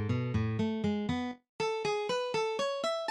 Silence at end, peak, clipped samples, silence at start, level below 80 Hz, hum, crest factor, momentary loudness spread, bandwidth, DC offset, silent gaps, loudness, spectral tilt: 0 s; -20 dBFS; under 0.1%; 0 s; -58 dBFS; none; 12 dB; 4 LU; 11.5 kHz; under 0.1%; 1.49-1.59 s; -33 LUFS; -6 dB/octave